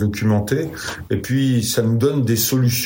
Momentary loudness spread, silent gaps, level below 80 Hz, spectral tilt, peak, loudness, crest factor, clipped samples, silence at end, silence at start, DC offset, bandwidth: 8 LU; none; -48 dBFS; -5.5 dB/octave; -6 dBFS; -19 LUFS; 12 dB; under 0.1%; 0 s; 0 s; under 0.1%; 16.5 kHz